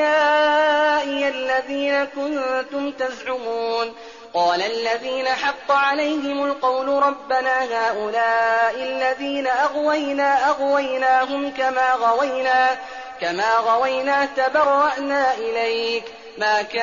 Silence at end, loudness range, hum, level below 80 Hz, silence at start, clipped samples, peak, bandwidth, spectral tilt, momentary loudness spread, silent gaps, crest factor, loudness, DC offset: 0 s; 4 LU; none; -62 dBFS; 0 s; under 0.1%; -8 dBFS; 7.4 kHz; 0.5 dB/octave; 8 LU; none; 12 dB; -20 LUFS; 0.1%